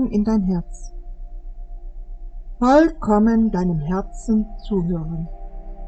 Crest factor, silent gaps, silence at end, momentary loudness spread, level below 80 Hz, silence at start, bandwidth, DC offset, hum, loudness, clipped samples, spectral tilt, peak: 18 dB; none; 0 s; 25 LU; -32 dBFS; 0 s; 8.6 kHz; under 0.1%; none; -20 LUFS; under 0.1%; -8 dB/octave; -2 dBFS